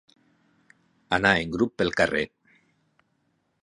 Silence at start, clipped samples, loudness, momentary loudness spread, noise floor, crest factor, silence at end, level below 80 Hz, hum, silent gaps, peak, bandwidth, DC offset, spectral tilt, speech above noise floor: 1.1 s; under 0.1%; -24 LUFS; 8 LU; -72 dBFS; 26 dB; 1.35 s; -52 dBFS; none; none; -2 dBFS; 11 kHz; under 0.1%; -5 dB/octave; 48 dB